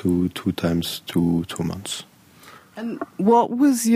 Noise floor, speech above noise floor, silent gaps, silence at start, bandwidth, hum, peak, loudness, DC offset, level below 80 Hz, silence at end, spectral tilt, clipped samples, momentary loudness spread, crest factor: -47 dBFS; 27 dB; none; 0 s; 15.5 kHz; none; -4 dBFS; -22 LUFS; under 0.1%; -50 dBFS; 0 s; -5.5 dB/octave; under 0.1%; 14 LU; 16 dB